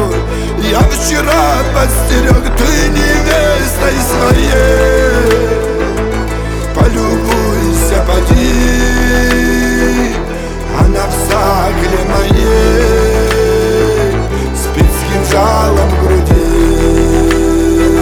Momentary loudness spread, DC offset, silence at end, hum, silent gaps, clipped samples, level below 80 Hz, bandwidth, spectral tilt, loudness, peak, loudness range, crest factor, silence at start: 5 LU; under 0.1%; 0 s; none; none; under 0.1%; -14 dBFS; 20 kHz; -5 dB/octave; -11 LUFS; 0 dBFS; 2 LU; 10 dB; 0 s